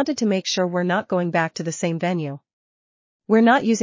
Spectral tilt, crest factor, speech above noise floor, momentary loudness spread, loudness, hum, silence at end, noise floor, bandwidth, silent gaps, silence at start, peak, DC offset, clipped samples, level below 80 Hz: -5 dB/octave; 18 dB; over 70 dB; 10 LU; -21 LUFS; none; 0 s; under -90 dBFS; 7.6 kHz; 2.53-3.20 s; 0 s; -4 dBFS; under 0.1%; under 0.1%; -70 dBFS